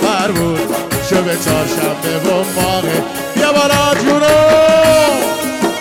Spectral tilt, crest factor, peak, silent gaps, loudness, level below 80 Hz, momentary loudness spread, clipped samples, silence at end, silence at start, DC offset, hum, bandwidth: -4 dB/octave; 10 dB; -4 dBFS; none; -13 LUFS; -40 dBFS; 8 LU; under 0.1%; 0 s; 0 s; under 0.1%; none; 17.5 kHz